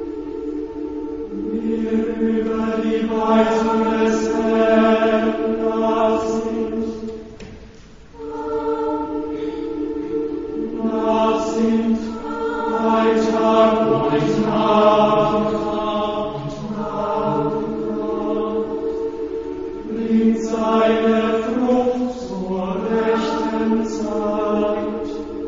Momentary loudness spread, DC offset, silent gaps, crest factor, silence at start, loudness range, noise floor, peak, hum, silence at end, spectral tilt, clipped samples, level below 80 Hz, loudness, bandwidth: 12 LU; under 0.1%; none; 16 dB; 0 s; 7 LU; -41 dBFS; -2 dBFS; none; 0 s; -6.5 dB/octave; under 0.1%; -46 dBFS; -20 LUFS; 7.6 kHz